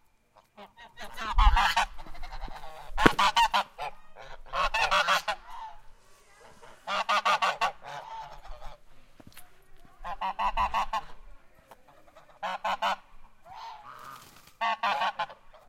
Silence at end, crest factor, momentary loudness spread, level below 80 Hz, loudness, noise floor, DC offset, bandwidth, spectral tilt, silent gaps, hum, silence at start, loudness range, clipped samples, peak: 0.1 s; 30 dB; 23 LU; -38 dBFS; -28 LUFS; -63 dBFS; under 0.1%; 16 kHz; -3 dB/octave; none; none; 0.6 s; 9 LU; under 0.1%; 0 dBFS